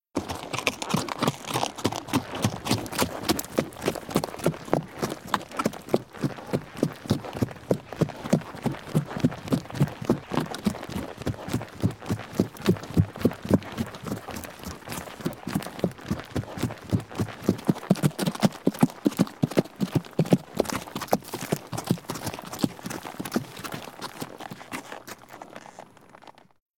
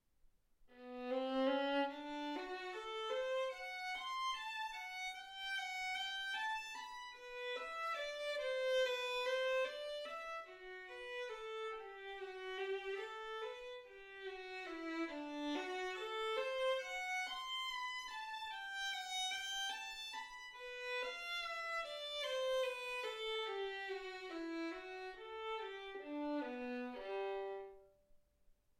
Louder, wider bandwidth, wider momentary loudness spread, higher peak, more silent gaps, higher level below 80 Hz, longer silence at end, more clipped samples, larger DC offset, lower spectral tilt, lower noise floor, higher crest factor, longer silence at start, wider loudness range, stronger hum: first, -29 LUFS vs -43 LUFS; about the same, 17.5 kHz vs 16.5 kHz; about the same, 11 LU vs 11 LU; first, -4 dBFS vs -28 dBFS; neither; first, -52 dBFS vs -76 dBFS; second, 0.5 s vs 0.65 s; neither; neither; first, -5.5 dB/octave vs -1 dB/octave; second, -51 dBFS vs -72 dBFS; first, 24 dB vs 16 dB; second, 0.15 s vs 0.6 s; about the same, 7 LU vs 6 LU; neither